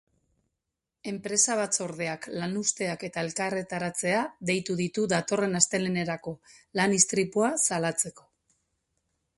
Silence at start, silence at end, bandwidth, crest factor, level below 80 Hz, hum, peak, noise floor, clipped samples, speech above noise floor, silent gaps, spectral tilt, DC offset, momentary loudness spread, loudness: 1.05 s; 1.2 s; 11.5 kHz; 28 dB; -68 dBFS; none; -2 dBFS; -85 dBFS; under 0.1%; 57 dB; none; -3 dB/octave; under 0.1%; 10 LU; -27 LUFS